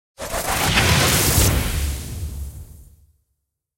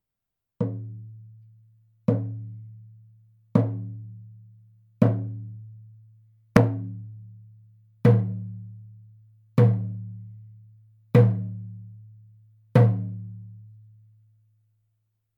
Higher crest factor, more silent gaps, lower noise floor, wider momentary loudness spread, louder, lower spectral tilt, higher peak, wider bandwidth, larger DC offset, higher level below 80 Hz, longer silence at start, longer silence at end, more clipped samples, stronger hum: second, 18 dB vs 26 dB; neither; second, -75 dBFS vs -85 dBFS; second, 16 LU vs 25 LU; first, -18 LUFS vs -24 LUFS; second, -3 dB/octave vs -9.5 dB/octave; about the same, -4 dBFS vs -2 dBFS; first, 16.5 kHz vs 6.2 kHz; neither; first, -30 dBFS vs -62 dBFS; second, 0.2 s vs 0.6 s; second, 0.95 s vs 1.7 s; neither; neither